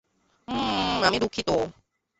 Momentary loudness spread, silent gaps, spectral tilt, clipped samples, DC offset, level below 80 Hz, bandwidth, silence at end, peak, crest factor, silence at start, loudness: 9 LU; none; -4 dB/octave; under 0.1%; under 0.1%; -50 dBFS; 8.2 kHz; 0.45 s; -8 dBFS; 20 dB; 0.5 s; -26 LUFS